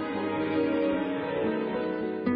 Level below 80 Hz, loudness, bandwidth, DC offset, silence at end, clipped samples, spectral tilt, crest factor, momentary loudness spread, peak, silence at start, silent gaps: -58 dBFS; -29 LUFS; 5 kHz; under 0.1%; 0 s; under 0.1%; -9.5 dB/octave; 14 dB; 4 LU; -14 dBFS; 0 s; none